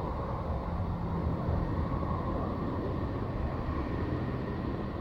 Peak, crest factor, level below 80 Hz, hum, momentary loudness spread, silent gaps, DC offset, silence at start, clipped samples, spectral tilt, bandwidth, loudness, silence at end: -20 dBFS; 12 dB; -38 dBFS; none; 3 LU; none; under 0.1%; 0 s; under 0.1%; -9.5 dB/octave; 6.2 kHz; -34 LUFS; 0 s